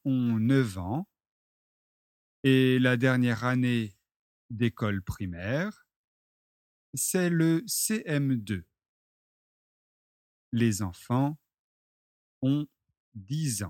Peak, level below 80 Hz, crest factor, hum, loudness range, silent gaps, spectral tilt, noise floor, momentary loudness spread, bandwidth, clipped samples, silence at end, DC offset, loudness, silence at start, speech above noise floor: -10 dBFS; -60 dBFS; 20 dB; none; 6 LU; 1.31-2.43 s, 4.16-4.49 s, 5.96-6.93 s, 8.89-10.52 s, 11.59-12.41 s, 12.97-13.12 s; -5.5 dB/octave; under -90 dBFS; 13 LU; 16.5 kHz; under 0.1%; 0 s; under 0.1%; -28 LUFS; 0.05 s; over 63 dB